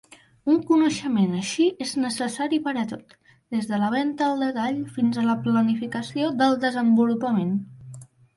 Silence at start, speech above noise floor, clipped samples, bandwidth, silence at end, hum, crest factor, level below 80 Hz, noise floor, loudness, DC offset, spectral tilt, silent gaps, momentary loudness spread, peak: 0.45 s; 21 dB; under 0.1%; 11.5 kHz; 0.35 s; none; 14 dB; -66 dBFS; -44 dBFS; -23 LUFS; under 0.1%; -5.5 dB/octave; none; 9 LU; -8 dBFS